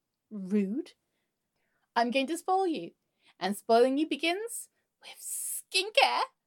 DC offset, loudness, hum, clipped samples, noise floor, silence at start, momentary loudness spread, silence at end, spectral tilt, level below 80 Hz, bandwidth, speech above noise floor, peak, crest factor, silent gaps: under 0.1%; -29 LUFS; none; under 0.1%; -81 dBFS; 0.3 s; 18 LU; 0.2 s; -3 dB/octave; under -90 dBFS; 17.5 kHz; 52 dB; -8 dBFS; 22 dB; none